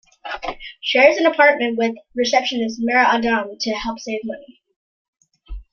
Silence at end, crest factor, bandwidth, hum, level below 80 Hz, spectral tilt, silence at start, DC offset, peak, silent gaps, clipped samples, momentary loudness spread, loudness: 0.1 s; 18 dB; 7.2 kHz; none; -46 dBFS; -3 dB/octave; 0.25 s; under 0.1%; -2 dBFS; 4.76-5.13 s; under 0.1%; 15 LU; -18 LUFS